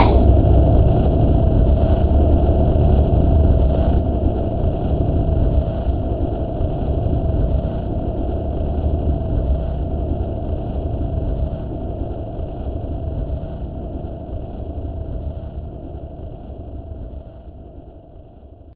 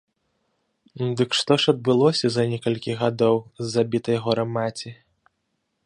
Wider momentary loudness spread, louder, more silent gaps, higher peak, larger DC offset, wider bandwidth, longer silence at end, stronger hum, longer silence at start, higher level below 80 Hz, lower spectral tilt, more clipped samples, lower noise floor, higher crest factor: first, 18 LU vs 9 LU; about the same, -20 LUFS vs -22 LUFS; neither; first, 0 dBFS vs -4 dBFS; neither; second, 4.3 kHz vs 10.5 kHz; second, 0 s vs 0.95 s; neither; second, 0 s vs 0.95 s; first, -20 dBFS vs -64 dBFS; first, -13.5 dB/octave vs -5.5 dB/octave; neither; second, -41 dBFS vs -75 dBFS; about the same, 18 dB vs 20 dB